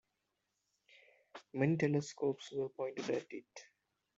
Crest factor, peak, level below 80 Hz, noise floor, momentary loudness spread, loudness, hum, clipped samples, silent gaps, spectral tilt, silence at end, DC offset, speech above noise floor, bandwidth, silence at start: 22 dB; -18 dBFS; -80 dBFS; -86 dBFS; 23 LU; -38 LUFS; none; under 0.1%; none; -6.5 dB/octave; 0.55 s; under 0.1%; 49 dB; 8 kHz; 1.35 s